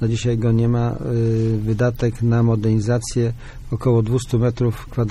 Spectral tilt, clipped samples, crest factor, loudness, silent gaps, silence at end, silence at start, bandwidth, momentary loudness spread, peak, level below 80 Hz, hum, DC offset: -7.5 dB/octave; under 0.1%; 12 dB; -20 LUFS; none; 0 s; 0 s; 11.5 kHz; 5 LU; -6 dBFS; -36 dBFS; none; under 0.1%